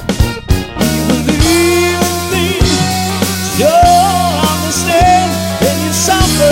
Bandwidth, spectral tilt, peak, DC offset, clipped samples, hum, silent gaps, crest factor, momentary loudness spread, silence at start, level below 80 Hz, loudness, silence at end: 17 kHz; -4 dB/octave; 0 dBFS; under 0.1%; under 0.1%; none; none; 10 dB; 6 LU; 0 s; -22 dBFS; -11 LUFS; 0 s